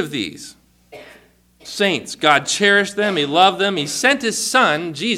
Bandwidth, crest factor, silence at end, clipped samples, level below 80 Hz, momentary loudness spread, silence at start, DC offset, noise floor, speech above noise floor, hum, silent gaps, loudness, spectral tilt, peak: 16.5 kHz; 18 dB; 0 s; under 0.1%; -60 dBFS; 10 LU; 0 s; under 0.1%; -51 dBFS; 33 dB; none; none; -16 LUFS; -2.5 dB/octave; 0 dBFS